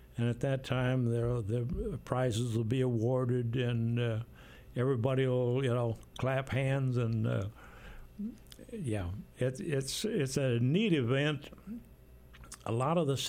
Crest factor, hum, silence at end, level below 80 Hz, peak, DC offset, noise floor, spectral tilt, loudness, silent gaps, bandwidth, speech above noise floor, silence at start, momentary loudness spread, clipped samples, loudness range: 16 dB; none; 0 s; -54 dBFS; -16 dBFS; under 0.1%; -55 dBFS; -6.5 dB/octave; -33 LUFS; none; 15.5 kHz; 23 dB; 0 s; 14 LU; under 0.1%; 4 LU